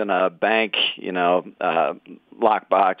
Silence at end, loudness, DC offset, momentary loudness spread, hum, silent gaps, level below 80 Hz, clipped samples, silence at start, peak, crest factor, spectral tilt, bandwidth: 0.05 s; -21 LUFS; under 0.1%; 5 LU; none; none; -74 dBFS; under 0.1%; 0 s; -2 dBFS; 18 dB; -7 dB/octave; 4.9 kHz